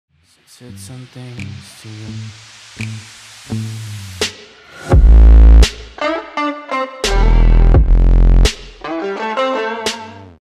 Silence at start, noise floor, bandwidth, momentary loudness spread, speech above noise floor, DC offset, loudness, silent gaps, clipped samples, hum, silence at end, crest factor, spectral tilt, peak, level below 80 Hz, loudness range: 0.7 s; -38 dBFS; 11 kHz; 24 LU; 10 dB; under 0.1%; -14 LUFS; none; under 0.1%; none; 0.35 s; 12 dB; -5.5 dB/octave; 0 dBFS; -14 dBFS; 16 LU